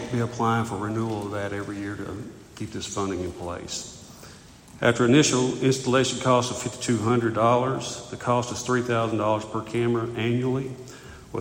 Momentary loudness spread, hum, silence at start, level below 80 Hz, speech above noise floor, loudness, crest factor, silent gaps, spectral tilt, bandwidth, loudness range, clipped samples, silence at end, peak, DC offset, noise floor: 15 LU; none; 0 s; -54 dBFS; 22 dB; -25 LUFS; 20 dB; none; -5 dB/octave; 16.5 kHz; 9 LU; under 0.1%; 0 s; -6 dBFS; under 0.1%; -47 dBFS